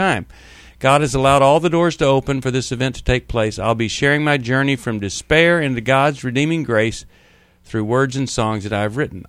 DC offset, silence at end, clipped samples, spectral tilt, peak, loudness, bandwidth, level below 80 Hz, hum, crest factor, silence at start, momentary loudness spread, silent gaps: under 0.1%; 0.05 s; under 0.1%; -5.5 dB/octave; 0 dBFS; -17 LUFS; 13 kHz; -38 dBFS; none; 18 dB; 0 s; 8 LU; none